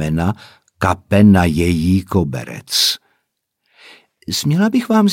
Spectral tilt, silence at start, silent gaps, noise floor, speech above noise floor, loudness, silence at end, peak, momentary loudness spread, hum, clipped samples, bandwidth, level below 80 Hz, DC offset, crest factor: -5 dB/octave; 0 s; none; -72 dBFS; 57 dB; -15 LUFS; 0 s; 0 dBFS; 13 LU; none; under 0.1%; 17 kHz; -38 dBFS; under 0.1%; 16 dB